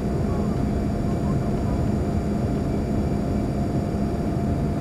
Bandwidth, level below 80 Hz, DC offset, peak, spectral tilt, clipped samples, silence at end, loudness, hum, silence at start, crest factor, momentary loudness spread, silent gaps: 13.5 kHz; -32 dBFS; under 0.1%; -12 dBFS; -8.5 dB/octave; under 0.1%; 0 s; -24 LUFS; none; 0 s; 12 dB; 1 LU; none